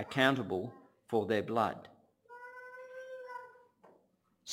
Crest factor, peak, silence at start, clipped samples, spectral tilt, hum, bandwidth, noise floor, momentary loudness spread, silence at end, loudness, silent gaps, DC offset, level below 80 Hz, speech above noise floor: 24 dB; -12 dBFS; 0 s; under 0.1%; -5 dB/octave; none; 16.5 kHz; -73 dBFS; 22 LU; 0 s; -34 LUFS; none; under 0.1%; -76 dBFS; 41 dB